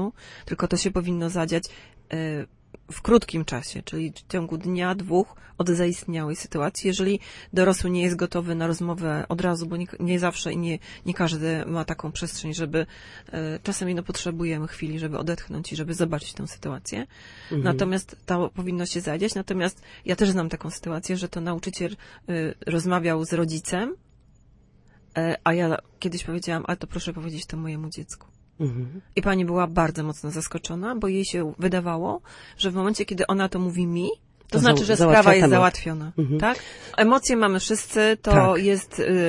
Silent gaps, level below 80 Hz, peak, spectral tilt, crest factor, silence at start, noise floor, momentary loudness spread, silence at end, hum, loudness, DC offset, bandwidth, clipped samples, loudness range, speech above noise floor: none; -44 dBFS; -4 dBFS; -5.5 dB/octave; 22 dB; 0 s; -56 dBFS; 13 LU; 0 s; none; -25 LUFS; under 0.1%; 11.5 kHz; under 0.1%; 10 LU; 31 dB